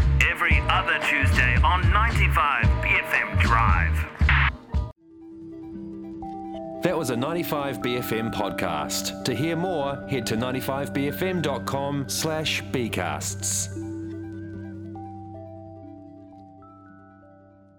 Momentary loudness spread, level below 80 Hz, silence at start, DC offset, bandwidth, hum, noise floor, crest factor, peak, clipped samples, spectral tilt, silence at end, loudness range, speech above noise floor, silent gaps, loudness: 18 LU; -30 dBFS; 0 s; under 0.1%; 19.5 kHz; none; -52 dBFS; 20 dB; -4 dBFS; under 0.1%; -4.5 dB/octave; 0.75 s; 12 LU; 28 dB; none; -24 LUFS